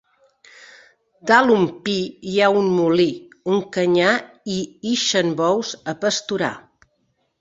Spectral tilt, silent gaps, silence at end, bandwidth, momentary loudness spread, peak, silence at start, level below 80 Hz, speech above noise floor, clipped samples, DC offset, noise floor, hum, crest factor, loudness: -4 dB/octave; none; 0.8 s; 8 kHz; 11 LU; -2 dBFS; 1.25 s; -62 dBFS; 49 dB; under 0.1%; under 0.1%; -68 dBFS; none; 18 dB; -19 LUFS